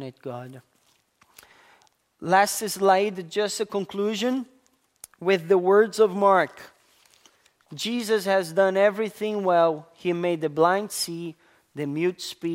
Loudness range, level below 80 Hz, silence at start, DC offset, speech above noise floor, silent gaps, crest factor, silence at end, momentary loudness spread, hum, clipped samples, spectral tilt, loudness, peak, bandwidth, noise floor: 3 LU; -76 dBFS; 0 s; under 0.1%; 42 dB; none; 20 dB; 0 s; 16 LU; none; under 0.1%; -4.5 dB/octave; -23 LUFS; -6 dBFS; 16 kHz; -66 dBFS